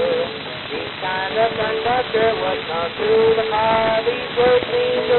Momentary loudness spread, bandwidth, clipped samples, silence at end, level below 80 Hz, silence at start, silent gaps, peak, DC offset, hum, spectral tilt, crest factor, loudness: 9 LU; 4.3 kHz; under 0.1%; 0 s; -50 dBFS; 0 s; none; -4 dBFS; under 0.1%; none; -1.5 dB/octave; 14 dB; -19 LUFS